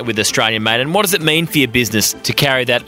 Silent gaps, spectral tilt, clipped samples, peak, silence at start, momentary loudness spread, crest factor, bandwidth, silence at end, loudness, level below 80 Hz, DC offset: none; -3 dB/octave; under 0.1%; 0 dBFS; 0 s; 2 LU; 16 dB; 16.5 kHz; 0 s; -14 LUFS; -46 dBFS; under 0.1%